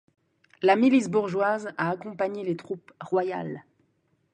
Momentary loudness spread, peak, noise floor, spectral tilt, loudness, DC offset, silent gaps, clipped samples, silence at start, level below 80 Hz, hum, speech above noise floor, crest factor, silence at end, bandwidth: 16 LU; -6 dBFS; -70 dBFS; -6.5 dB/octave; -26 LUFS; under 0.1%; none; under 0.1%; 0.6 s; -74 dBFS; none; 45 dB; 22 dB; 0.75 s; 9.6 kHz